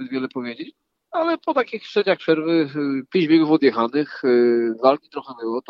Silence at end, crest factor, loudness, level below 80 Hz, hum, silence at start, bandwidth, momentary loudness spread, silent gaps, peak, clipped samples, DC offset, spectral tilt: 0.1 s; 20 dB; -20 LUFS; -80 dBFS; none; 0 s; 6 kHz; 13 LU; none; 0 dBFS; under 0.1%; under 0.1%; -7.5 dB/octave